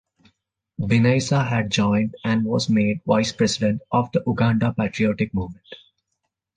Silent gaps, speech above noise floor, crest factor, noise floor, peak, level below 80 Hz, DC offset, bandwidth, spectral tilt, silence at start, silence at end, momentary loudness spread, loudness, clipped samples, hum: none; 57 dB; 18 dB; -78 dBFS; -4 dBFS; -48 dBFS; under 0.1%; 9.6 kHz; -6 dB/octave; 0.8 s; 0.8 s; 7 LU; -21 LUFS; under 0.1%; none